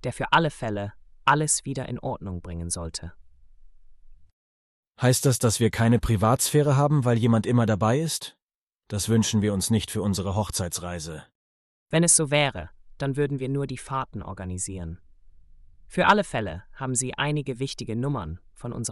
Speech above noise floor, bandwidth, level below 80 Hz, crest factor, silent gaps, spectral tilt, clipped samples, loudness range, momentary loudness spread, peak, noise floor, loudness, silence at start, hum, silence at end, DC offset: 60 dB; 13.5 kHz; -48 dBFS; 18 dB; 4.33-4.83 s, 8.42-8.47 s, 8.54-8.67 s, 11.35-11.86 s; -4.5 dB/octave; under 0.1%; 8 LU; 14 LU; -6 dBFS; -84 dBFS; -24 LUFS; 0.05 s; none; 0 s; under 0.1%